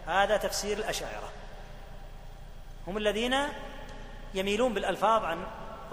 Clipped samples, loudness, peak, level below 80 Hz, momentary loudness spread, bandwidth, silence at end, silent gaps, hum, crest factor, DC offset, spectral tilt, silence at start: under 0.1%; -30 LUFS; -12 dBFS; -44 dBFS; 23 LU; 15.5 kHz; 0 s; none; none; 20 dB; under 0.1%; -3.5 dB/octave; 0 s